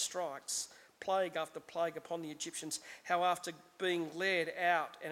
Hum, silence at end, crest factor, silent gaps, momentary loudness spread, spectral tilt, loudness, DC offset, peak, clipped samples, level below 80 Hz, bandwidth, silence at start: none; 0 s; 20 dB; none; 10 LU; -2 dB/octave; -37 LUFS; under 0.1%; -18 dBFS; under 0.1%; -82 dBFS; 16.5 kHz; 0 s